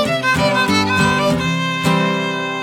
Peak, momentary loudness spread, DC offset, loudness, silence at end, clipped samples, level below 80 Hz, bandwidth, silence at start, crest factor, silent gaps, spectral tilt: -2 dBFS; 4 LU; under 0.1%; -16 LUFS; 0 s; under 0.1%; -44 dBFS; 16.5 kHz; 0 s; 14 dB; none; -4.5 dB/octave